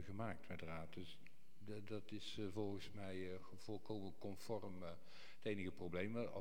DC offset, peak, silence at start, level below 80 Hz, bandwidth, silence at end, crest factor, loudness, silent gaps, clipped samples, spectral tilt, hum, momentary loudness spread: 0.4%; -32 dBFS; 0 s; -74 dBFS; 17.5 kHz; 0 s; 20 dB; -50 LUFS; none; under 0.1%; -6 dB/octave; none; 10 LU